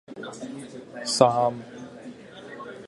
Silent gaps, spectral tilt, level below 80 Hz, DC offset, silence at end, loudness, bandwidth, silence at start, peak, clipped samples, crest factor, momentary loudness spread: none; -4 dB/octave; -68 dBFS; under 0.1%; 0 s; -24 LUFS; 11.5 kHz; 0.1 s; -2 dBFS; under 0.1%; 26 dB; 22 LU